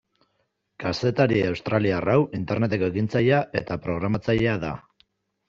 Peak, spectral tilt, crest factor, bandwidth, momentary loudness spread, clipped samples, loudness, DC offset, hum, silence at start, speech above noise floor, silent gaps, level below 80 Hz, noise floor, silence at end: -6 dBFS; -6 dB/octave; 20 dB; 7.4 kHz; 8 LU; under 0.1%; -24 LUFS; under 0.1%; none; 0.8 s; 50 dB; none; -52 dBFS; -73 dBFS; 0.7 s